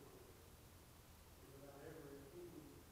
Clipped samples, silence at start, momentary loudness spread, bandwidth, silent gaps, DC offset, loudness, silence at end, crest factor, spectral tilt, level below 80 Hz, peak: under 0.1%; 0 s; 7 LU; 16 kHz; none; under 0.1%; -60 LUFS; 0 s; 16 dB; -5 dB/octave; -70 dBFS; -44 dBFS